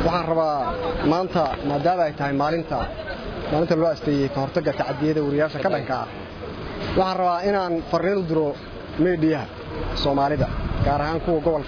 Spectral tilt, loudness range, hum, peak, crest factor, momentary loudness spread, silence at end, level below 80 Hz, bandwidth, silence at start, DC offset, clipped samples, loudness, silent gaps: -7.5 dB/octave; 1 LU; none; -6 dBFS; 16 dB; 10 LU; 0 s; -38 dBFS; 5.4 kHz; 0 s; under 0.1%; under 0.1%; -23 LUFS; none